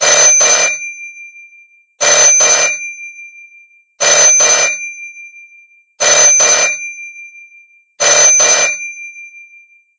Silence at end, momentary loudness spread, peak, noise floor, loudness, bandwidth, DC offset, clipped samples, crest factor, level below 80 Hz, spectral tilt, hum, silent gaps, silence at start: 0.6 s; 22 LU; 0 dBFS; -45 dBFS; -7 LUFS; 8 kHz; under 0.1%; under 0.1%; 12 dB; -56 dBFS; 2.5 dB/octave; none; none; 0 s